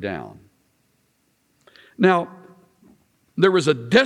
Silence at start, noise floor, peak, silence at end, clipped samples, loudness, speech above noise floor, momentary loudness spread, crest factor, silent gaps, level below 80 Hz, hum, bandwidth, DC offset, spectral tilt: 0 s; -66 dBFS; -2 dBFS; 0 s; under 0.1%; -20 LUFS; 47 dB; 18 LU; 20 dB; none; -64 dBFS; none; 11 kHz; under 0.1%; -5.5 dB/octave